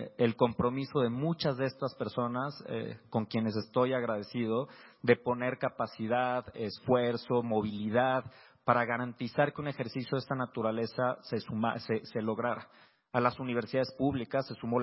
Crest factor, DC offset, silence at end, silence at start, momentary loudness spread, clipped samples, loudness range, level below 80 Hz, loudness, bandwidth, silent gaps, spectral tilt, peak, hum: 22 dB; under 0.1%; 0 s; 0 s; 8 LU; under 0.1%; 3 LU; -64 dBFS; -33 LUFS; 5.8 kHz; none; -10 dB/octave; -10 dBFS; none